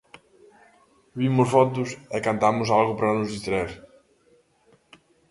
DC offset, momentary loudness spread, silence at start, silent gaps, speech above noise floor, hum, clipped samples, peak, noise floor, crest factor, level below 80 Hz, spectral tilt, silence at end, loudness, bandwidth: under 0.1%; 11 LU; 1.15 s; none; 39 dB; none; under 0.1%; -4 dBFS; -61 dBFS; 20 dB; -56 dBFS; -6.5 dB/octave; 1.5 s; -23 LUFS; 11.5 kHz